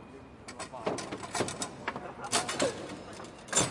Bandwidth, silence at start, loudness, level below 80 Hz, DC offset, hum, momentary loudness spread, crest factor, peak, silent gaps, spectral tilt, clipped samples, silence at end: 11.5 kHz; 0 s; -34 LUFS; -62 dBFS; under 0.1%; none; 16 LU; 24 dB; -12 dBFS; none; -2.5 dB/octave; under 0.1%; 0 s